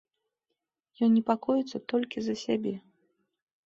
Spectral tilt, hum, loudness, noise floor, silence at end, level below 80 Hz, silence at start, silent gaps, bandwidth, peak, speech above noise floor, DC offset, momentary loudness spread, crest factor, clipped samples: -6 dB/octave; none; -29 LUFS; -85 dBFS; 0.9 s; -74 dBFS; 1 s; none; 7.4 kHz; -10 dBFS; 57 dB; under 0.1%; 8 LU; 20 dB; under 0.1%